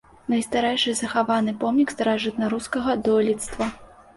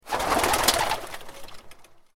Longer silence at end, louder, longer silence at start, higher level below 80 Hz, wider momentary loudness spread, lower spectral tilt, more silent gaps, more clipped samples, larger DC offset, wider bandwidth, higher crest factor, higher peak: first, 0.3 s vs 0.15 s; about the same, -23 LUFS vs -23 LUFS; first, 0.3 s vs 0.05 s; second, -52 dBFS vs -44 dBFS; second, 5 LU vs 22 LU; first, -4 dB/octave vs -1.5 dB/octave; neither; neither; neither; second, 11.5 kHz vs 16.5 kHz; second, 16 dB vs 24 dB; second, -8 dBFS vs -4 dBFS